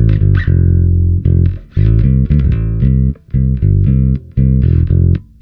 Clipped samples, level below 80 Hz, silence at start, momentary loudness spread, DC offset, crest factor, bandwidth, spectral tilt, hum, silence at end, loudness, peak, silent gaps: under 0.1%; -16 dBFS; 0 s; 4 LU; under 0.1%; 10 dB; 4.1 kHz; -12 dB/octave; none; 0.2 s; -12 LUFS; 0 dBFS; none